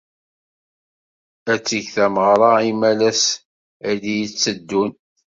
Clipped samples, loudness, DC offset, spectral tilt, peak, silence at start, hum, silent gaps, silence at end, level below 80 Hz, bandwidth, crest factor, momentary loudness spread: under 0.1%; -18 LUFS; under 0.1%; -3 dB/octave; -2 dBFS; 1.45 s; none; 3.45-3.80 s; 0.4 s; -62 dBFS; 7.8 kHz; 18 dB; 11 LU